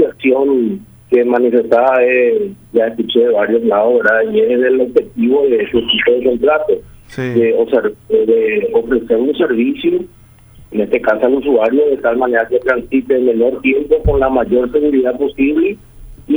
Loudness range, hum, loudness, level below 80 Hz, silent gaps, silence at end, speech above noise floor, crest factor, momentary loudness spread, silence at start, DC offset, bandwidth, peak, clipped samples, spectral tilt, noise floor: 2 LU; none; -13 LUFS; -34 dBFS; none; 0 s; 28 dB; 12 dB; 5 LU; 0 s; under 0.1%; over 20 kHz; 0 dBFS; under 0.1%; -7 dB/octave; -41 dBFS